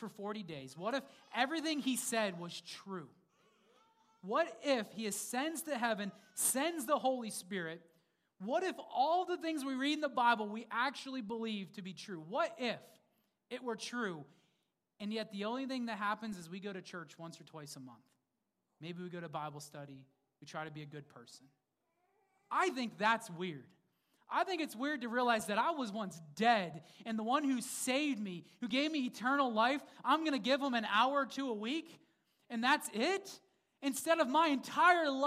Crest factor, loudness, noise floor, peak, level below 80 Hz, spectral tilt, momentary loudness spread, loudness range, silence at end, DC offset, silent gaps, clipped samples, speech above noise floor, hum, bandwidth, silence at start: 22 dB; -36 LUFS; -86 dBFS; -16 dBFS; -88 dBFS; -3 dB/octave; 17 LU; 14 LU; 0 s; under 0.1%; none; under 0.1%; 49 dB; none; 15.5 kHz; 0 s